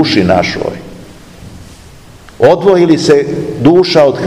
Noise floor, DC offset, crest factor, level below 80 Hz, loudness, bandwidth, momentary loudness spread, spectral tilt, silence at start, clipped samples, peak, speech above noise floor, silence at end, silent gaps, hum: -35 dBFS; 0.4%; 10 dB; -40 dBFS; -9 LUFS; 12.5 kHz; 11 LU; -6 dB/octave; 0 s; 2%; 0 dBFS; 27 dB; 0 s; none; none